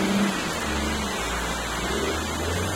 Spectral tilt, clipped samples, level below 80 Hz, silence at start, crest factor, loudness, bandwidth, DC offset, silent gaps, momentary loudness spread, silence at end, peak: -4 dB/octave; under 0.1%; -36 dBFS; 0 s; 14 dB; -26 LUFS; 16.5 kHz; under 0.1%; none; 3 LU; 0 s; -12 dBFS